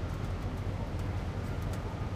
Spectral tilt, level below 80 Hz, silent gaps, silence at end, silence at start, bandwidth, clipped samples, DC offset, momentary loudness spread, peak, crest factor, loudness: -7 dB/octave; -40 dBFS; none; 0 s; 0 s; 15.5 kHz; under 0.1%; under 0.1%; 1 LU; -24 dBFS; 10 dB; -37 LUFS